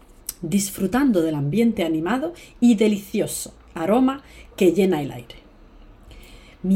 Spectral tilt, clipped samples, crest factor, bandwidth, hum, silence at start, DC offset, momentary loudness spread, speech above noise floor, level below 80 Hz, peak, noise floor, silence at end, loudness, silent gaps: -5.5 dB/octave; under 0.1%; 16 dB; 16.5 kHz; none; 0.3 s; under 0.1%; 14 LU; 26 dB; -48 dBFS; -6 dBFS; -47 dBFS; 0 s; -21 LUFS; none